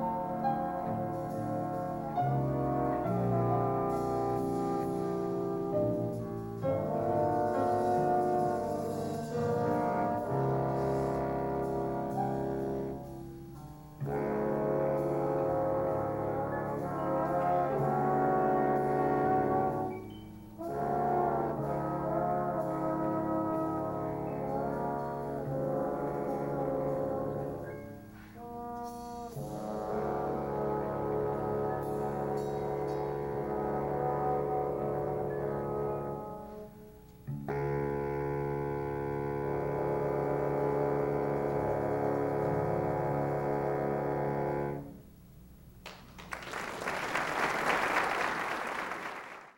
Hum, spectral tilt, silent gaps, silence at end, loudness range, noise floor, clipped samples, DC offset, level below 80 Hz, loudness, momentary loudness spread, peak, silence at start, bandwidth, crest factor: none; -7.5 dB/octave; none; 0.05 s; 6 LU; -54 dBFS; under 0.1%; under 0.1%; -54 dBFS; -33 LUFS; 12 LU; -16 dBFS; 0 s; 16.5 kHz; 18 dB